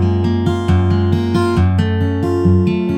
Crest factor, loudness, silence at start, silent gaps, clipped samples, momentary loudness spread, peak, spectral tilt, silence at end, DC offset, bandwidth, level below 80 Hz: 12 dB; -15 LUFS; 0 s; none; under 0.1%; 3 LU; -2 dBFS; -8.5 dB/octave; 0 s; under 0.1%; 9 kHz; -34 dBFS